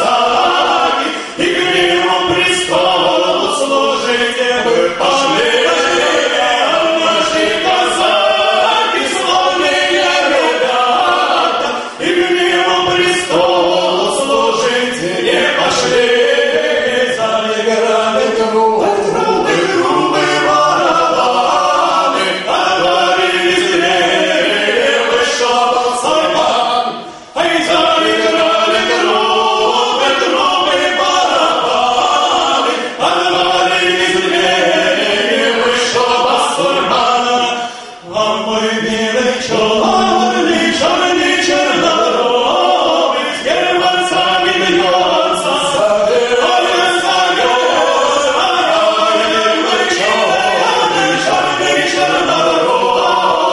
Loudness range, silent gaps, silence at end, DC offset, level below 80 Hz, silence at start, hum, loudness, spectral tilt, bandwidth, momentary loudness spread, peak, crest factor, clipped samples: 1 LU; none; 0 s; under 0.1%; -50 dBFS; 0 s; none; -12 LUFS; -2.5 dB/octave; 11.5 kHz; 3 LU; 0 dBFS; 12 dB; under 0.1%